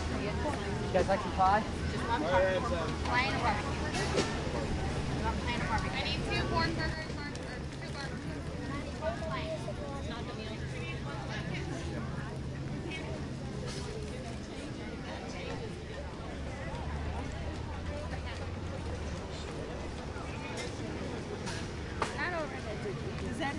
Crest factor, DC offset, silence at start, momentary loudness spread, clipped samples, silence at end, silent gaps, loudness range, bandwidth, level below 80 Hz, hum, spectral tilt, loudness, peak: 20 dB; under 0.1%; 0 s; 10 LU; under 0.1%; 0 s; none; 9 LU; 11.5 kHz; -44 dBFS; none; -5.5 dB/octave; -35 LUFS; -14 dBFS